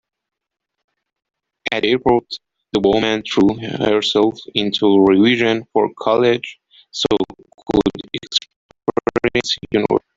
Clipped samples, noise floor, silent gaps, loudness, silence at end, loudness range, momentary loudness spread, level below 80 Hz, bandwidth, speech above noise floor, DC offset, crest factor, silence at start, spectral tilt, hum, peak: under 0.1%; -79 dBFS; 8.56-8.69 s; -17 LUFS; 0.2 s; 5 LU; 12 LU; -48 dBFS; 7.8 kHz; 63 dB; under 0.1%; 18 dB; 1.65 s; -5 dB/octave; none; 0 dBFS